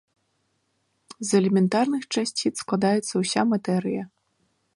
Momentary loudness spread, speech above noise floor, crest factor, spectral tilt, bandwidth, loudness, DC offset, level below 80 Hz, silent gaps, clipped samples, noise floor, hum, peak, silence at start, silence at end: 9 LU; 49 dB; 18 dB; -5 dB/octave; 11.5 kHz; -24 LUFS; under 0.1%; -70 dBFS; none; under 0.1%; -72 dBFS; none; -8 dBFS; 1.2 s; 0.7 s